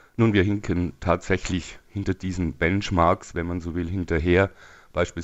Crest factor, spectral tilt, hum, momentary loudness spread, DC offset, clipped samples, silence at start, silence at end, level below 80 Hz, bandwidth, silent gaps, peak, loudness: 18 dB; -6.5 dB/octave; none; 9 LU; under 0.1%; under 0.1%; 0.2 s; 0 s; -42 dBFS; 8.2 kHz; none; -6 dBFS; -24 LUFS